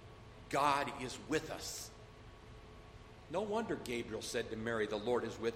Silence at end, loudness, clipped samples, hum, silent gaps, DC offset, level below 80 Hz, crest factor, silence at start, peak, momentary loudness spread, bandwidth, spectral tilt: 0 s; -38 LUFS; under 0.1%; none; none; under 0.1%; -60 dBFS; 22 dB; 0 s; -18 dBFS; 22 LU; 16 kHz; -4 dB/octave